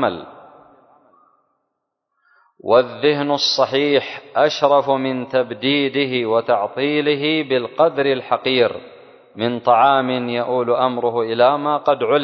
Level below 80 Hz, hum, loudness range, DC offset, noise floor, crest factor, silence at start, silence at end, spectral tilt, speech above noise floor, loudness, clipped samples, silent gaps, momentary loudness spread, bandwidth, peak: -64 dBFS; none; 3 LU; under 0.1%; -76 dBFS; 18 dB; 0 s; 0 s; -5 dB/octave; 58 dB; -18 LUFS; under 0.1%; none; 6 LU; 6.4 kHz; 0 dBFS